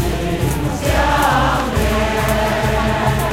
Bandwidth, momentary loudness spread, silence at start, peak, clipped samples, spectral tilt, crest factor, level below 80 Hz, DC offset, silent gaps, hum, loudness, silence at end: 16.5 kHz; 5 LU; 0 s; -4 dBFS; under 0.1%; -5 dB/octave; 14 dB; -24 dBFS; under 0.1%; none; none; -17 LUFS; 0 s